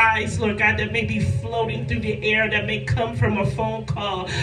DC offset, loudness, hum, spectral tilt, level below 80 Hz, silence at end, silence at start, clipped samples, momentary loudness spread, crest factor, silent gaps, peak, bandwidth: under 0.1%; -22 LUFS; none; -5.5 dB/octave; -40 dBFS; 0 s; 0 s; under 0.1%; 7 LU; 18 dB; none; -4 dBFS; 10.5 kHz